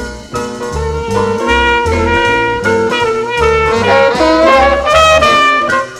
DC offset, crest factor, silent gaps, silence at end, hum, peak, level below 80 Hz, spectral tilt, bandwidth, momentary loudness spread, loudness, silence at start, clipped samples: under 0.1%; 10 dB; none; 0 s; none; 0 dBFS; -26 dBFS; -4.5 dB/octave; 15.5 kHz; 11 LU; -10 LUFS; 0 s; under 0.1%